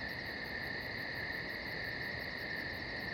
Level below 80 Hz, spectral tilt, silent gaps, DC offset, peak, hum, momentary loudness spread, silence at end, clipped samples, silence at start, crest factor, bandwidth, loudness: -58 dBFS; -5 dB/octave; none; under 0.1%; -28 dBFS; none; 1 LU; 0 s; under 0.1%; 0 s; 14 dB; 18 kHz; -40 LUFS